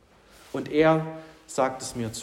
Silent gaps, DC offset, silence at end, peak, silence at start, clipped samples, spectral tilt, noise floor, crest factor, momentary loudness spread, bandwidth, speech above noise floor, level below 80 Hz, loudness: none; under 0.1%; 0 s; -8 dBFS; 0.55 s; under 0.1%; -5.5 dB/octave; -54 dBFS; 18 dB; 16 LU; 16 kHz; 29 dB; -58 dBFS; -26 LUFS